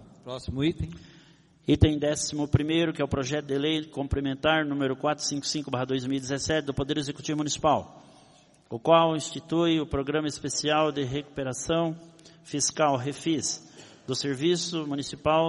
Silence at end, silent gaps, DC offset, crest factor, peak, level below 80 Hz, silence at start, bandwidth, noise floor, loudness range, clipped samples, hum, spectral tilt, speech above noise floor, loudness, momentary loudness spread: 0 s; none; under 0.1%; 22 dB; -6 dBFS; -46 dBFS; 0 s; 11.5 kHz; -57 dBFS; 3 LU; under 0.1%; none; -4.5 dB/octave; 31 dB; -27 LUFS; 10 LU